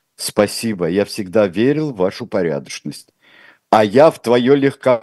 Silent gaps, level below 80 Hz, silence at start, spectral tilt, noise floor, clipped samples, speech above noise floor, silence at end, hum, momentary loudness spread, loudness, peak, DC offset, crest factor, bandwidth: none; -60 dBFS; 0.2 s; -5.5 dB/octave; -48 dBFS; under 0.1%; 33 dB; 0 s; none; 12 LU; -16 LUFS; 0 dBFS; under 0.1%; 16 dB; 12.5 kHz